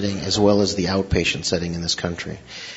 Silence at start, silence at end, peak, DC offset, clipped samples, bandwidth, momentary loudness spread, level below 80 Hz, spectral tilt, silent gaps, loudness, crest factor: 0 s; 0 s; -2 dBFS; under 0.1%; under 0.1%; 8 kHz; 13 LU; -40 dBFS; -4.5 dB/octave; none; -21 LUFS; 18 dB